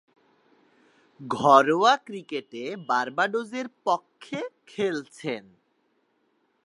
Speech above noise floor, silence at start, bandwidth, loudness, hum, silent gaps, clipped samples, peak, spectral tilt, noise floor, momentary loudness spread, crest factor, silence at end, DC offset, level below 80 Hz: 45 dB; 1.2 s; 11.5 kHz; -25 LUFS; none; none; under 0.1%; -4 dBFS; -4.5 dB/octave; -70 dBFS; 17 LU; 24 dB; 1.25 s; under 0.1%; -74 dBFS